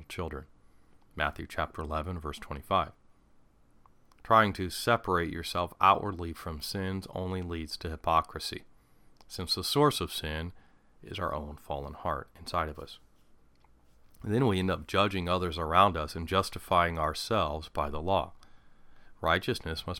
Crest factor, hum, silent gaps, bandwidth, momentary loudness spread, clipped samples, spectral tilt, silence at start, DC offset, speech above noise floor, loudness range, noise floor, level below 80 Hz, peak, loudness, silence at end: 24 dB; none; none; 17.5 kHz; 14 LU; under 0.1%; -5 dB/octave; 0 s; under 0.1%; 30 dB; 7 LU; -61 dBFS; -48 dBFS; -8 dBFS; -30 LUFS; 0 s